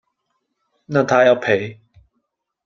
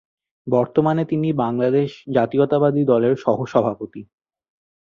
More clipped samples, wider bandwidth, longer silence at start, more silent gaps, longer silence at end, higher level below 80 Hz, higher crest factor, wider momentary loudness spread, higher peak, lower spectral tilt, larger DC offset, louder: neither; about the same, 7.2 kHz vs 7.2 kHz; first, 0.9 s vs 0.45 s; neither; about the same, 0.9 s vs 0.85 s; about the same, -62 dBFS vs -60 dBFS; about the same, 20 dB vs 18 dB; about the same, 8 LU vs 9 LU; about the same, 0 dBFS vs -2 dBFS; second, -6 dB/octave vs -9 dB/octave; neither; about the same, -17 LUFS vs -19 LUFS